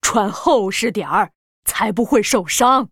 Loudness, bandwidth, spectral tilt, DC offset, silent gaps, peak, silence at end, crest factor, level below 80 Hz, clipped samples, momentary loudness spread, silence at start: -17 LUFS; 19.5 kHz; -3 dB/octave; under 0.1%; 1.35-1.63 s; -2 dBFS; 0.05 s; 16 dB; -48 dBFS; under 0.1%; 7 LU; 0.05 s